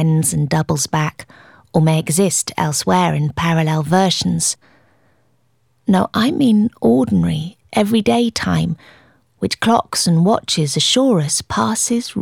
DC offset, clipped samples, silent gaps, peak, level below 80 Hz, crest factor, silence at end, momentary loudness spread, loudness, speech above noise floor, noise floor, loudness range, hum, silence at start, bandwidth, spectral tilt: under 0.1%; under 0.1%; none; 0 dBFS; -46 dBFS; 16 dB; 0 s; 6 LU; -16 LUFS; 46 dB; -62 dBFS; 2 LU; none; 0 s; 16.5 kHz; -4.5 dB/octave